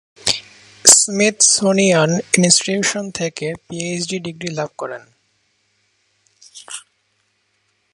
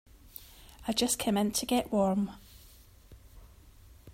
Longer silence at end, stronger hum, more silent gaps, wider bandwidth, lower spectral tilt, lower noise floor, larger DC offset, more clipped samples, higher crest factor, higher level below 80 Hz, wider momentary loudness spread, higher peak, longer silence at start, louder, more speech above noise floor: first, 1.15 s vs 0 s; neither; neither; about the same, 16 kHz vs 16 kHz; second, -2.5 dB/octave vs -4 dB/octave; first, -65 dBFS vs -56 dBFS; neither; neither; about the same, 18 dB vs 20 dB; about the same, -58 dBFS vs -56 dBFS; about the same, 20 LU vs 21 LU; first, 0 dBFS vs -14 dBFS; about the same, 0.25 s vs 0.25 s; first, -15 LUFS vs -30 LUFS; first, 48 dB vs 27 dB